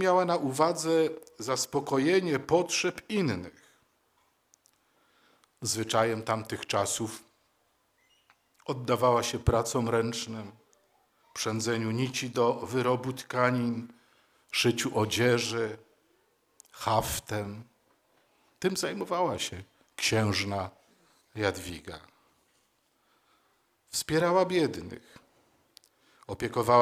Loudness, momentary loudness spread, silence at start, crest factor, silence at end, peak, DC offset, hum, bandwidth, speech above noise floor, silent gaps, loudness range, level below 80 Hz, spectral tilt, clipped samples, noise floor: -29 LUFS; 16 LU; 0 s; 22 dB; 0 s; -8 dBFS; under 0.1%; none; 16 kHz; 43 dB; none; 6 LU; -54 dBFS; -4.5 dB/octave; under 0.1%; -72 dBFS